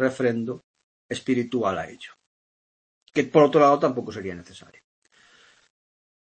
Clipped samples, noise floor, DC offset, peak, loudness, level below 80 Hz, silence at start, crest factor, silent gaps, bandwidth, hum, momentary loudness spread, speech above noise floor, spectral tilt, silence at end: under 0.1%; -57 dBFS; under 0.1%; -4 dBFS; -23 LUFS; -66 dBFS; 0 s; 22 dB; 0.64-0.74 s, 0.84-1.09 s, 2.26-3.01 s; 8.8 kHz; none; 21 LU; 34 dB; -6.5 dB/octave; 1.65 s